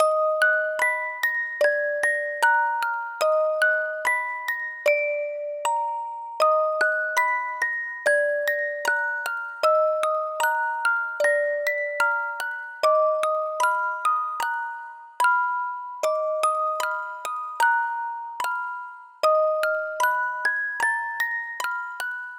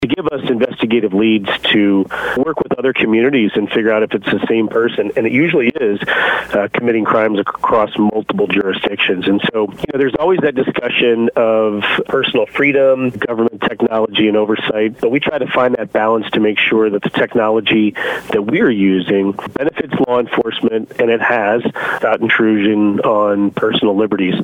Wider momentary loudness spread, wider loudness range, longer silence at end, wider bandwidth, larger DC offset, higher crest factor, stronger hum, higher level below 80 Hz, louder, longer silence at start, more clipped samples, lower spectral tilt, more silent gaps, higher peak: first, 9 LU vs 5 LU; about the same, 2 LU vs 1 LU; about the same, 0 s vs 0 s; first, over 20 kHz vs 10.5 kHz; neither; about the same, 16 dB vs 14 dB; neither; second, -82 dBFS vs -50 dBFS; second, -24 LUFS vs -14 LUFS; about the same, 0 s vs 0 s; neither; second, 1.5 dB/octave vs -7 dB/octave; neither; second, -8 dBFS vs 0 dBFS